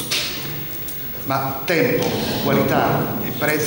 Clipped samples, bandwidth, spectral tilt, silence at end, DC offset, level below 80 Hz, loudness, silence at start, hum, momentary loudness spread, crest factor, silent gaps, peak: under 0.1%; 17.5 kHz; -4.5 dB/octave; 0 s; under 0.1%; -46 dBFS; -20 LUFS; 0 s; none; 7 LU; 16 dB; none; -4 dBFS